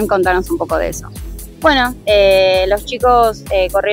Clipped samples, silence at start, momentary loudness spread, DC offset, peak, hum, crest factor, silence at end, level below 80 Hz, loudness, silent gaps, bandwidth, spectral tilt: under 0.1%; 0 s; 14 LU; under 0.1%; 0 dBFS; none; 14 dB; 0 s; -30 dBFS; -13 LUFS; none; 16.5 kHz; -4 dB/octave